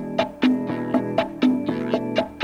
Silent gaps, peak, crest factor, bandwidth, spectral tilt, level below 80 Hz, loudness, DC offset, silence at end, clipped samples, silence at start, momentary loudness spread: none; -6 dBFS; 16 dB; 7.2 kHz; -7 dB/octave; -54 dBFS; -23 LUFS; under 0.1%; 0 s; under 0.1%; 0 s; 4 LU